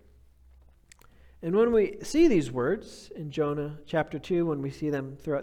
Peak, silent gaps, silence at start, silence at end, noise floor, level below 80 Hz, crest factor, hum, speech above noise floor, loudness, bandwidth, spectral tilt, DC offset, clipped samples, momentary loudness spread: -10 dBFS; none; 1.4 s; 0 s; -57 dBFS; -52 dBFS; 18 dB; none; 30 dB; -28 LUFS; 13 kHz; -6.5 dB/octave; under 0.1%; under 0.1%; 12 LU